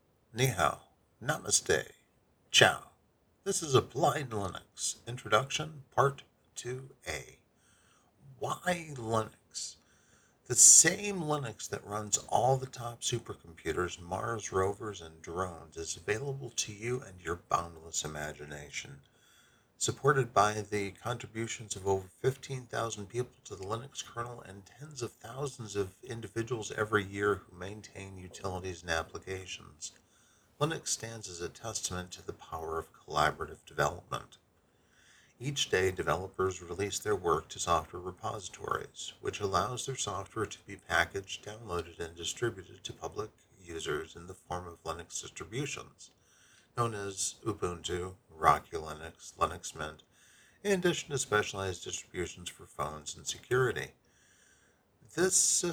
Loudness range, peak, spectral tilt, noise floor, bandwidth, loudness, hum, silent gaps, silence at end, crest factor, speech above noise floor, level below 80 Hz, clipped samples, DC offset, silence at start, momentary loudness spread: 14 LU; -6 dBFS; -2.5 dB/octave; -70 dBFS; over 20 kHz; -32 LUFS; none; none; 0 s; 28 dB; 36 dB; -60 dBFS; under 0.1%; under 0.1%; 0.35 s; 14 LU